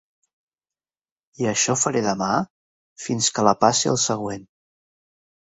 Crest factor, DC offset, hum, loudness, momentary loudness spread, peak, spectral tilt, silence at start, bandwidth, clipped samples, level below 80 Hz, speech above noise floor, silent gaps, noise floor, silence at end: 22 dB; under 0.1%; none; -21 LUFS; 14 LU; -2 dBFS; -3.5 dB/octave; 1.4 s; 8.4 kHz; under 0.1%; -62 dBFS; over 69 dB; 2.50-2.96 s; under -90 dBFS; 1.15 s